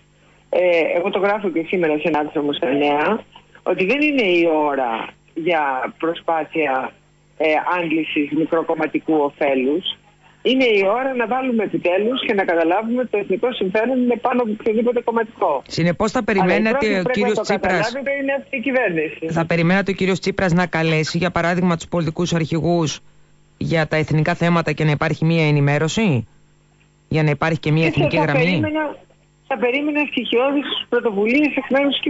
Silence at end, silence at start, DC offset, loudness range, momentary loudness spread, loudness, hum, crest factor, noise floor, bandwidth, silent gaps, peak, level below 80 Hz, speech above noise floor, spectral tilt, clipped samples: 0 s; 0.5 s; under 0.1%; 2 LU; 6 LU; -19 LUFS; 50 Hz at -45 dBFS; 12 dB; -55 dBFS; 8 kHz; none; -8 dBFS; -50 dBFS; 36 dB; -6 dB/octave; under 0.1%